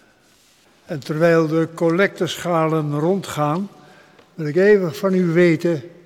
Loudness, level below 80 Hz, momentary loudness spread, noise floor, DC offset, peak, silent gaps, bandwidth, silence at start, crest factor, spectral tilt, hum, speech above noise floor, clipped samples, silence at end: -18 LUFS; -64 dBFS; 11 LU; -55 dBFS; under 0.1%; -4 dBFS; none; 15.5 kHz; 0.9 s; 16 dB; -6.5 dB/octave; none; 37 dB; under 0.1%; 0.15 s